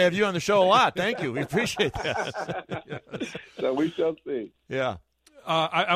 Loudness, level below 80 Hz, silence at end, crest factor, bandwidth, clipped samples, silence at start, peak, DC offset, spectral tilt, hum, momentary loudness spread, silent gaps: -26 LUFS; -56 dBFS; 0 s; 20 dB; 15.5 kHz; under 0.1%; 0 s; -6 dBFS; under 0.1%; -4.5 dB/octave; none; 15 LU; none